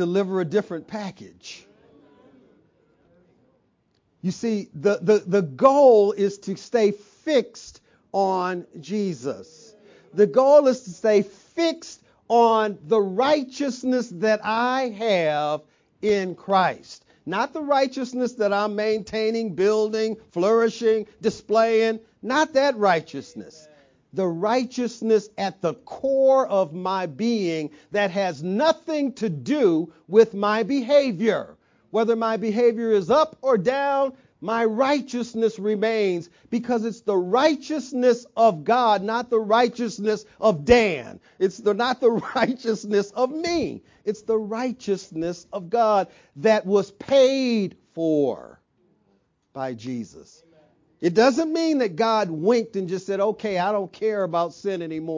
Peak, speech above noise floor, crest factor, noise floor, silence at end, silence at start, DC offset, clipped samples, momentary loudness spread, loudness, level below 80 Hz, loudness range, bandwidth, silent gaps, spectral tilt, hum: -4 dBFS; 46 dB; 20 dB; -67 dBFS; 0 s; 0 s; under 0.1%; under 0.1%; 13 LU; -22 LUFS; -58 dBFS; 5 LU; 7.6 kHz; none; -5.5 dB/octave; none